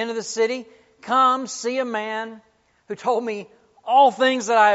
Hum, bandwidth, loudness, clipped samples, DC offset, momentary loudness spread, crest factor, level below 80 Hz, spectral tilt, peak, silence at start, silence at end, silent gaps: none; 8 kHz; -21 LUFS; under 0.1%; under 0.1%; 18 LU; 18 dB; -76 dBFS; -1 dB/octave; -4 dBFS; 0 s; 0 s; none